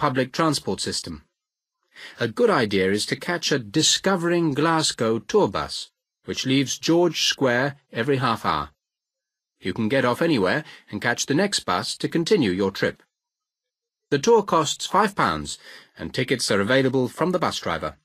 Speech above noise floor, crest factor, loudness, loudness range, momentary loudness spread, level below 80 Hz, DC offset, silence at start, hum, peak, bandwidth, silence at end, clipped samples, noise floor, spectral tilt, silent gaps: 64 dB; 20 dB; -22 LUFS; 3 LU; 11 LU; -56 dBFS; under 0.1%; 0 s; none; -4 dBFS; 15.5 kHz; 0.1 s; under 0.1%; -87 dBFS; -4 dB/octave; none